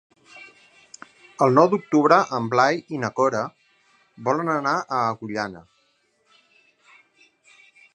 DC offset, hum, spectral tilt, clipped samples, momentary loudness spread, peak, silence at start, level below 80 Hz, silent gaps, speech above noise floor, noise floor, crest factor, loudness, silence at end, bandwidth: under 0.1%; none; -6 dB/octave; under 0.1%; 13 LU; -2 dBFS; 0.35 s; -70 dBFS; none; 45 dB; -66 dBFS; 22 dB; -21 LUFS; 2.35 s; 9.8 kHz